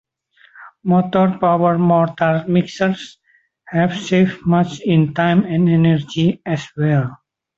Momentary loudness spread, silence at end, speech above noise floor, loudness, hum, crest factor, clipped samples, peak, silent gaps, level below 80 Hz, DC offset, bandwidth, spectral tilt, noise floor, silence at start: 8 LU; 0.4 s; 38 dB; -17 LUFS; none; 16 dB; under 0.1%; -2 dBFS; none; -54 dBFS; under 0.1%; 7.6 kHz; -7.5 dB/octave; -54 dBFS; 0.6 s